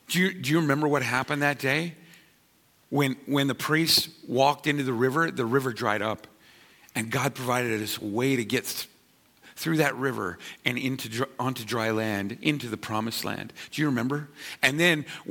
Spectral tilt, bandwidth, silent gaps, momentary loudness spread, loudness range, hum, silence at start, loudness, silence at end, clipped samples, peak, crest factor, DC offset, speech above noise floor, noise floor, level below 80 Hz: -4.5 dB/octave; 17.5 kHz; none; 10 LU; 5 LU; none; 0.1 s; -26 LUFS; 0 s; under 0.1%; -6 dBFS; 22 dB; under 0.1%; 36 dB; -63 dBFS; -66 dBFS